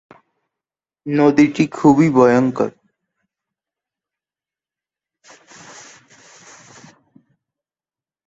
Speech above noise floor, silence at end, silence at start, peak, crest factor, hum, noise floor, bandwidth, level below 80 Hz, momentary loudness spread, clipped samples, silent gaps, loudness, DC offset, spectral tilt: over 76 dB; 5.6 s; 1.05 s; -2 dBFS; 18 dB; none; under -90 dBFS; 8 kHz; -58 dBFS; 21 LU; under 0.1%; none; -15 LUFS; under 0.1%; -7 dB/octave